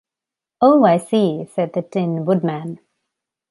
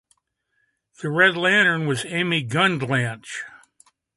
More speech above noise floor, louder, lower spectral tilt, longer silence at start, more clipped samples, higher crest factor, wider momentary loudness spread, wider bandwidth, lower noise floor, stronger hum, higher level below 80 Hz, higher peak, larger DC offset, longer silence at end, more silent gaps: first, 70 dB vs 51 dB; first, -17 LUFS vs -20 LUFS; first, -7.5 dB/octave vs -4.5 dB/octave; second, 0.6 s vs 1 s; neither; about the same, 16 dB vs 20 dB; about the same, 14 LU vs 16 LU; about the same, 11.5 kHz vs 11.5 kHz; first, -87 dBFS vs -72 dBFS; neither; about the same, -66 dBFS vs -66 dBFS; about the same, -2 dBFS vs -2 dBFS; neither; first, 0.75 s vs 0.6 s; neither